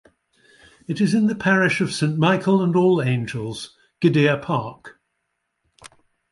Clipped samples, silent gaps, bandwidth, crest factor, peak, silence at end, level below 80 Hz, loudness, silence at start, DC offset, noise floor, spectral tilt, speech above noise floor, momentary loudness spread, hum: under 0.1%; none; 11.5 kHz; 18 dB; -4 dBFS; 0.45 s; -60 dBFS; -20 LUFS; 0.9 s; under 0.1%; -75 dBFS; -6.5 dB/octave; 56 dB; 13 LU; none